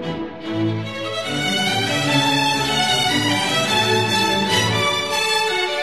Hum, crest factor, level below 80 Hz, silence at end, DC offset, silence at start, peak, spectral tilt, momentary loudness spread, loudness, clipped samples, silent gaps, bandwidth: none; 14 dB; -50 dBFS; 0 s; 0.5%; 0 s; -4 dBFS; -3 dB/octave; 8 LU; -18 LUFS; under 0.1%; none; 13.5 kHz